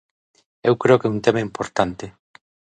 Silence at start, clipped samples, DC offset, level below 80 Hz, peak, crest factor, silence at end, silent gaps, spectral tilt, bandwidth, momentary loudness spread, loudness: 0.65 s; under 0.1%; under 0.1%; -54 dBFS; 0 dBFS; 20 dB; 0.7 s; none; -6.5 dB/octave; 9.2 kHz; 12 LU; -20 LUFS